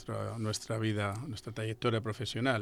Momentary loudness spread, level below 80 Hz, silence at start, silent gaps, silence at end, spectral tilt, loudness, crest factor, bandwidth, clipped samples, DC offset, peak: 6 LU; -62 dBFS; 0 s; none; 0 s; -5.5 dB/octave; -35 LUFS; 18 dB; 14 kHz; under 0.1%; under 0.1%; -16 dBFS